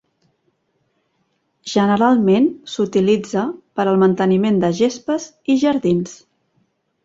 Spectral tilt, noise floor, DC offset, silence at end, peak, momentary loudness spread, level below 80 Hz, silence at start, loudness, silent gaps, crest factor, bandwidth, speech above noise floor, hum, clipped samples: -6.5 dB/octave; -67 dBFS; under 0.1%; 0.9 s; -2 dBFS; 9 LU; -60 dBFS; 1.65 s; -17 LUFS; none; 16 dB; 7.8 kHz; 51 dB; none; under 0.1%